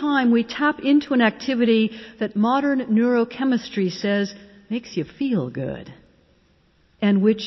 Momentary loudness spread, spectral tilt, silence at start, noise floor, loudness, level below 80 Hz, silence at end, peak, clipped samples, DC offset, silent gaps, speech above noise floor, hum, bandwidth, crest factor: 11 LU; -6.5 dB/octave; 0 s; -60 dBFS; -21 LUFS; -60 dBFS; 0 s; -6 dBFS; under 0.1%; under 0.1%; none; 39 dB; none; 6.2 kHz; 14 dB